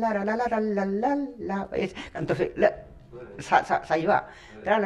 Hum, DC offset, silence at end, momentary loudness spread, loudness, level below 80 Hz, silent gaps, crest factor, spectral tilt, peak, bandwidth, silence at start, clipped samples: none; under 0.1%; 0 s; 18 LU; -26 LUFS; -54 dBFS; none; 20 dB; -6.5 dB/octave; -6 dBFS; 11 kHz; 0 s; under 0.1%